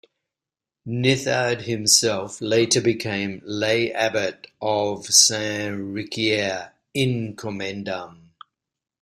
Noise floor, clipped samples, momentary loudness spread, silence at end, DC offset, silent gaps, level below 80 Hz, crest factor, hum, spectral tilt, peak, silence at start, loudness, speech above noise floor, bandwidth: -89 dBFS; under 0.1%; 14 LU; 0.9 s; under 0.1%; none; -60 dBFS; 22 dB; none; -3 dB/octave; 0 dBFS; 0.85 s; -21 LUFS; 66 dB; 15.5 kHz